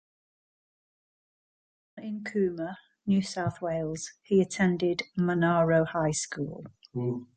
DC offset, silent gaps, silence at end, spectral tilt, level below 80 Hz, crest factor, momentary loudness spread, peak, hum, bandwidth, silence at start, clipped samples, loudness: under 0.1%; none; 0.1 s; -6 dB/octave; -62 dBFS; 18 dB; 14 LU; -12 dBFS; none; 9.6 kHz; 1.95 s; under 0.1%; -29 LUFS